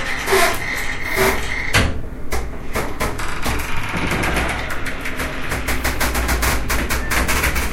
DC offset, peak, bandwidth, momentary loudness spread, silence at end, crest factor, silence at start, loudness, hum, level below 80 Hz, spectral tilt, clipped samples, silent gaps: under 0.1%; -2 dBFS; 16.5 kHz; 8 LU; 0 s; 18 dB; 0 s; -20 LUFS; none; -26 dBFS; -3.5 dB/octave; under 0.1%; none